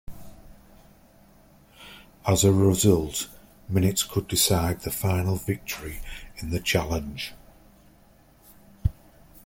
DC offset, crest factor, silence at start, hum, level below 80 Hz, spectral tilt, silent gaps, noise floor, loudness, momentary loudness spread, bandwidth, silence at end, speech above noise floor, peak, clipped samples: under 0.1%; 20 dB; 0.1 s; none; -44 dBFS; -4.5 dB/octave; none; -56 dBFS; -25 LUFS; 18 LU; 17 kHz; 0.55 s; 32 dB; -6 dBFS; under 0.1%